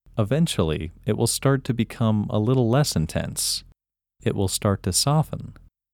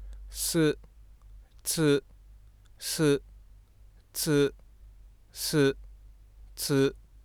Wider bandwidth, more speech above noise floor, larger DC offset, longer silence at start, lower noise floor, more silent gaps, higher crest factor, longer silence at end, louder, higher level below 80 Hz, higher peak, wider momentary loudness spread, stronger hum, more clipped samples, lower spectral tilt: second, 18 kHz vs over 20 kHz; first, 41 dB vs 29 dB; neither; first, 0.15 s vs 0 s; first, -63 dBFS vs -56 dBFS; neither; about the same, 16 dB vs 18 dB; first, 0.4 s vs 0.25 s; first, -23 LUFS vs -28 LUFS; first, -44 dBFS vs -50 dBFS; first, -6 dBFS vs -14 dBFS; second, 9 LU vs 14 LU; neither; neither; about the same, -5 dB/octave vs -4.5 dB/octave